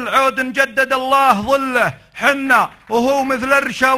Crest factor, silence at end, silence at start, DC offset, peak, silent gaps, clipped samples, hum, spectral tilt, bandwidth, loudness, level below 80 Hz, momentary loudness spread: 16 dB; 0 s; 0 s; under 0.1%; 0 dBFS; none; under 0.1%; none; -3.5 dB/octave; 15 kHz; -15 LUFS; -50 dBFS; 5 LU